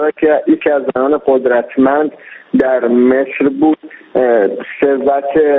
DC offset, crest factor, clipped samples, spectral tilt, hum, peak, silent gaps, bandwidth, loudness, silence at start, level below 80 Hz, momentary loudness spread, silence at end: under 0.1%; 12 dB; under 0.1%; -5 dB/octave; none; 0 dBFS; none; 4 kHz; -13 LUFS; 0 s; -52 dBFS; 5 LU; 0 s